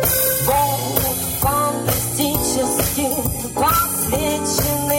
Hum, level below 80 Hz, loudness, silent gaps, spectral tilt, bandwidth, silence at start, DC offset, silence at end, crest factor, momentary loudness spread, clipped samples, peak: none; -34 dBFS; -18 LUFS; none; -3.5 dB/octave; 16.5 kHz; 0 s; under 0.1%; 0 s; 18 dB; 4 LU; under 0.1%; 0 dBFS